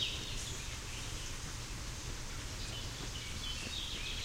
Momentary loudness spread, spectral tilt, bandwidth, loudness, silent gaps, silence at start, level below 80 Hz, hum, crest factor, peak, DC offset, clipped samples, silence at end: 4 LU; -2.5 dB/octave; 16 kHz; -41 LUFS; none; 0 s; -46 dBFS; none; 20 dB; -22 dBFS; under 0.1%; under 0.1%; 0 s